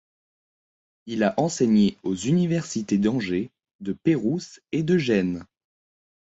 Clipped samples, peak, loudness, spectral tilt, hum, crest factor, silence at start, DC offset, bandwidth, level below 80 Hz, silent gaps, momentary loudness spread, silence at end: under 0.1%; -8 dBFS; -24 LUFS; -6 dB/octave; none; 16 dB; 1.05 s; under 0.1%; 8 kHz; -58 dBFS; 3.75-3.79 s; 12 LU; 0.85 s